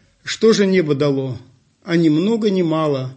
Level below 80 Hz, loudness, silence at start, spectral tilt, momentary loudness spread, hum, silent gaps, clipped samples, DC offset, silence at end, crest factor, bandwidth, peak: -62 dBFS; -17 LUFS; 0.25 s; -6 dB/octave; 10 LU; none; none; under 0.1%; under 0.1%; 0.05 s; 14 dB; 8.6 kHz; -4 dBFS